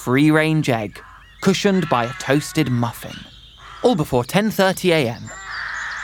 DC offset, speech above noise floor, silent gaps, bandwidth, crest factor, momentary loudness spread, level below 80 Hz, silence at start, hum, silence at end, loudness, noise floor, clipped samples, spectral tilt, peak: under 0.1%; 22 dB; none; 18.5 kHz; 18 dB; 15 LU; -48 dBFS; 0 s; none; 0 s; -19 LUFS; -40 dBFS; under 0.1%; -5.5 dB/octave; -2 dBFS